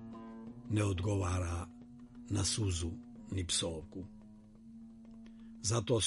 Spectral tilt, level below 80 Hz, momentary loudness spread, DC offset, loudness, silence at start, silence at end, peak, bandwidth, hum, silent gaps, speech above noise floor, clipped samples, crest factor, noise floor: -4.5 dB/octave; -54 dBFS; 20 LU; under 0.1%; -36 LUFS; 0 s; 0 s; -20 dBFS; 11.5 kHz; none; none; 21 dB; under 0.1%; 18 dB; -56 dBFS